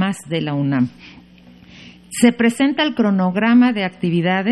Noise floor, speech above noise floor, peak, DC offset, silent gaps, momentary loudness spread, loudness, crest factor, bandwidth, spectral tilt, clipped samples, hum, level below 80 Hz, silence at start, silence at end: -45 dBFS; 28 dB; -2 dBFS; under 0.1%; none; 8 LU; -17 LUFS; 16 dB; 13 kHz; -5.5 dB/octave; under 0.1%; none; -58 dBFS; 0 s; 0 s